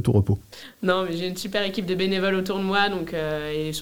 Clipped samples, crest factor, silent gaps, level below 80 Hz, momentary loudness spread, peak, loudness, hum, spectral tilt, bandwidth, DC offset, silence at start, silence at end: under 0.1%; 18 dB; none; -50 dBFS; 6 LU; -6 dBFS; -25 LUFS; none; -5.5 dB/octave; 17.5 kHz; 0.4%; 0 s; 0 s